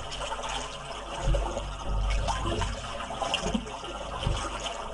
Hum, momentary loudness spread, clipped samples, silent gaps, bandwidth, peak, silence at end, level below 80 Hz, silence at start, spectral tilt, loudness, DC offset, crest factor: none; 7 LU; under 0.1%; none; 11.5 kHz; -12 dBFS; 0 s; -34 dBFS; 0 s; -4 dB/octave; -32 LUFS; under 0.1%; 18 dB